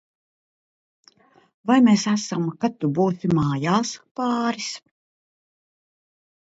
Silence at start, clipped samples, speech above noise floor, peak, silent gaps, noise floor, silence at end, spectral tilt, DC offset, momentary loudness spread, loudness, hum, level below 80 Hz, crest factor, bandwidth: 1.65 s; under 0.1%; 35 dB; -4 dBFS; 4.11-4.15 s; -56 dBFS; 1.75 s; -5.5 dB/octave; under 0.1%; 13 LU; -22 LUFS; none; -58 dBFS; 20 dB; 8 kHz